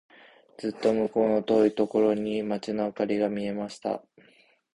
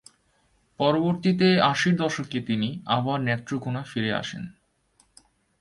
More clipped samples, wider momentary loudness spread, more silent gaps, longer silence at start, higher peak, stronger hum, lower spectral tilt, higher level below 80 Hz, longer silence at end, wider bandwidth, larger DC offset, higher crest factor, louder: neither; about the same, 10 LU vs 10 LU; neither; second, 0.6 s vs 0.8 s; second, -10 dBFS vs -6 dBFS; neither; about the same, -7 dB/octave vs -6 dB/octave; about the same, -64 dBFS vs -62 dBFS; second, 0.75 s vs 1.1 s; about the same, 11 kHz vs 11.5 kHz; neither; about the same, 18 dB vs 20 dB; second, -27 LUFS vs -24 LUFS